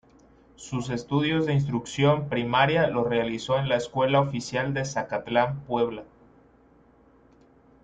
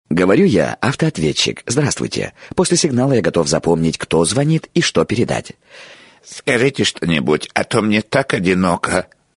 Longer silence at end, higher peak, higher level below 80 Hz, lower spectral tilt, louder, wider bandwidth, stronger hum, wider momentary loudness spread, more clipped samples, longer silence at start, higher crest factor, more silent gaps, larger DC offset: first, 1.8 s vs 0.35 s; second, -6 dBFS vs 0 dBFS; second, -56 dBFS vs -46 dBFS; first, -6 dB/octave vs -4.5 dB/octave; second, -25 LUFS vs -16 LUFS; second, 9.2 kHz vs 11 kHz; neither; about the same, 8 LU vs 6 LU; neither; first, 0.6 s vs 0.1 s; about the same, 20 dB vs 16 dB; neither; neither